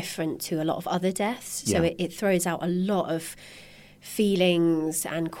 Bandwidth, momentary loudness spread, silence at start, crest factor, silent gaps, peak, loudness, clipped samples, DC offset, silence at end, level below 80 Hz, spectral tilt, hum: 17 kHz; 14 LU; 0 s; 18 dB; none; -10 dBFS; -26 LUFS; under 0.1%; under 0.1%; 0 s; -56 dBFS; -5 dB/octave; 50 Hz at -50 dBFS